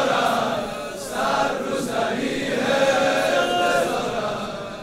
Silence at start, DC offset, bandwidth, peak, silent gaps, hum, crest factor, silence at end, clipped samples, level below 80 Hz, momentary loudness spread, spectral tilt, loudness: 0 s; under 0.1%; 16 kHz; -8 dBFS; none; none; 14 dB; 0 s; under 0.1%; -50 dBFS; 9 LU; -3.5 dB/octave; -22 LUFS